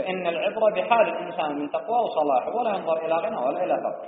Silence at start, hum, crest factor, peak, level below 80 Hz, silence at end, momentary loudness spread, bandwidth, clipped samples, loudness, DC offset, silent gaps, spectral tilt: 0 s; none; 18 dB; -8 dBFS; -74 dBFS; 0 s; 6 LU; 4.6 kHz; under 0.1%; -24 LUFS; under 0.1%; none; -3 dB/octave